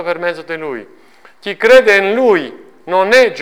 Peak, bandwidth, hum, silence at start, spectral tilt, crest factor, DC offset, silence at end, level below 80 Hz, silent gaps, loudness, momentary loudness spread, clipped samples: 0 dBFS; 14 kHz; none; 0 s; -3.5 dB/octave; 12 dB; under 0.1%; 0 s; -54 dBFS; none; -12 LUFS; 19 LU; under 0.1%